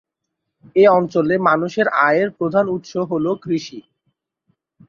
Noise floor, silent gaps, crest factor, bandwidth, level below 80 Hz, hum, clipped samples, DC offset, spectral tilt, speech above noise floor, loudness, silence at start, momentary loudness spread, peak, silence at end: -78 dBFS; none; 16 dB; 7.2 kHz; -62 dBFS; none; under 0.1%; under 0.1%; -6.5 dB/octave; 61 dB; -17 LUFS; 0.75 s; 10 LU; -2 dBFS; 1.1 s